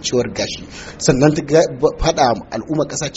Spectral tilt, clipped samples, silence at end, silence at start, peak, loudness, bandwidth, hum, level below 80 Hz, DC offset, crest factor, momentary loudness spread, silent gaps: -5 dB/octave; under 0.1%; 0 s; 0 s; 0 dBFS; -17 LUFS; 8 kHz; none; -36 dBFS; under 0.1%; 16 dB; 10 LU; none